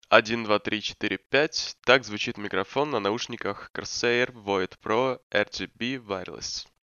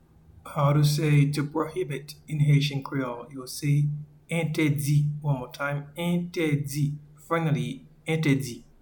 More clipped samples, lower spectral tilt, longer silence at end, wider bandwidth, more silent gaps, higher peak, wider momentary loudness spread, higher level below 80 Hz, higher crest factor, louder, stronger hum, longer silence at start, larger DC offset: neither; second, -3.5 dB/octave vs -6.5 dB/octave; about the same, 0.2 s vs 0.2 s; second, 7.4 kHz vs 19 kHz; first, 3.70-3.74 s, 5.23-5.30 s vs none; first, 0 dBFS vs -10 dBFS; about the same, 11 LU vs 13 LU; second, -62 dBFS vs -56 dBFS; first, 26 dB vs 16 dB; about the same, -27 LUFS vs -26 LUFS; neither; second, 0.1 s vs 0.45 s; neither